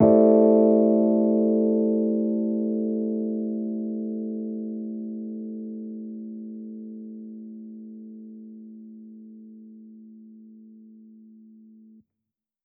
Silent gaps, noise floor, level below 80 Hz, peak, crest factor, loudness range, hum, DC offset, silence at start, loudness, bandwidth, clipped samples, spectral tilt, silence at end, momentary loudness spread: none; -86 dBFS; -68 dBFS; -4 dBFS; 20 dB; 24 LU; none; under 0.1%; 0 s; -23 LUFS; 2.3 kHz; under 0.1%; -13.5 dB/octave; 1.95 s; 26 LU